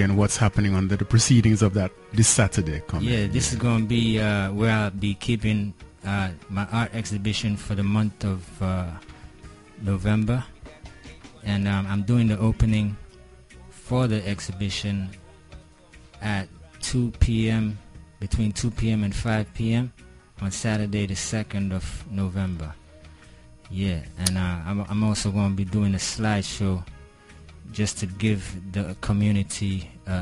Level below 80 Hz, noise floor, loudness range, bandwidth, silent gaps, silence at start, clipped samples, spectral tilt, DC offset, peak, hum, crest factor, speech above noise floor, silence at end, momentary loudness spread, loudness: -38 dBFS; -50 dBFS; 7 LU; 11.5 kHz; none; 0 s; under 0.1%; -5 dB/octave; under 0.1%; -4 dBFS; none; 20 dB; 26 dB; 0 s; 12 LU; -25 LUFS